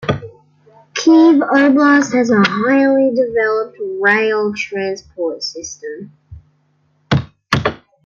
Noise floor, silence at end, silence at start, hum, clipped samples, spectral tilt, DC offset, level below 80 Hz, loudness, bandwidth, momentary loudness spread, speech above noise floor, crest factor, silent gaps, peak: -59 dBFS; 0.3 s; 0 s; none; under 0.1%; -5.5 dB/octave; under 0.1%; -48 dBFS; -14 LUFS; 7.4 kHz; 14 LU; 46 dB; 14 dB; none; -2 dBFS